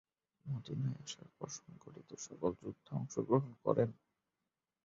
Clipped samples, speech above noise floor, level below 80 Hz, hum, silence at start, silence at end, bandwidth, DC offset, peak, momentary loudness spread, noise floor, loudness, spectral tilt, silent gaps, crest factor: under 0.1%; over 51 dB; -72 dBFS; none; 0.45 s; 0.95 s; 7.4 kHz; under 0.1%; -18 dBFS; 16 LU; under -90 dBFS; -40 LUFS; -7.5 dB/octave; none; 24 dB